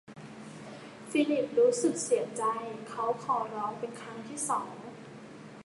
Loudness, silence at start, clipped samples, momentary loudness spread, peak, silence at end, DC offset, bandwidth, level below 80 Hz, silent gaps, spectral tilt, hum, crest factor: -31 LUFS; 0.1 s; under 0.1%; 20 LU; -14 dBFS; 0 s; under 0.1%; 11.5 kHz; -76 dBFS; none; -4 dB/octave; none; 18 dB